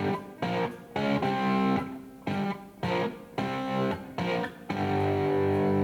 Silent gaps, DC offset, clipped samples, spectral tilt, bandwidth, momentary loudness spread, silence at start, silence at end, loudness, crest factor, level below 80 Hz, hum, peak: none; under 0.1%; under 0.1%; -7.5 dB/octave; 19.5 kHz; 8 LU; 0 s; 0 s; -30 LUFS; 14 dB; -60 dBFS; none; -14 dBFS